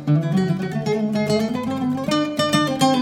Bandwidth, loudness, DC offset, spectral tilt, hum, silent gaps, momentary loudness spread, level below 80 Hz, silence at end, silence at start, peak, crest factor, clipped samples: 16 kHz; -21 LUFS; under 0.1%; -5.5 dB/octave; none; none; 5 LU; -56 dBFS; 0 s; 0 s; -4 dBFS; 16 dB; under 0.1%